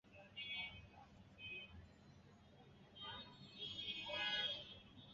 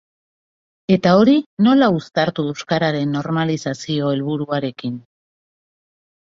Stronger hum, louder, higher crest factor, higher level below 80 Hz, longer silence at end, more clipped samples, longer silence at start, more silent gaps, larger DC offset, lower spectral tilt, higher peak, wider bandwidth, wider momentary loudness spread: neither; second, -47 LUFS vs -18 LUFS; about the same, 20 dB vs 18 dB; second, -72 dBFS vs -58 dBFS; second, 0 s vs 1.3 s; neither; second, 0.05 s vs 0.9 s; second, none vs 1.46-1.57 s; neither; second, 0 dB/octave vs -6.5 dB/octave; second, -30 dBFS vs -2 dBFS; about the same, 7.6 kHz vs 7.6 kHz; first, 24 LU vs 12 LU